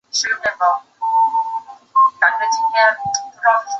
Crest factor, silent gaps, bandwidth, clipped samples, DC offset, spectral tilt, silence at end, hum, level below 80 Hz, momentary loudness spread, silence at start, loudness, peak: 16 dB; none; 8 kHz; under 0.1%; under 0.1%; 0.5 dB/octave; 0 s; none; -64 dBFS; 8 LU; 0.15 s; -17 LUFS; -2 dBFS